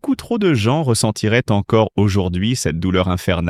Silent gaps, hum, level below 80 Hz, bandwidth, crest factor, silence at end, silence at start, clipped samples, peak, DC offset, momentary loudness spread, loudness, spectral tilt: none; none; -44 dBFS; 15 kHz; 16 dB; 0 s; 0.05 s; under 0.1%; -2 dBFS; under 0.1%; 3 LU; -17 LUFS; -5.5 dB/octave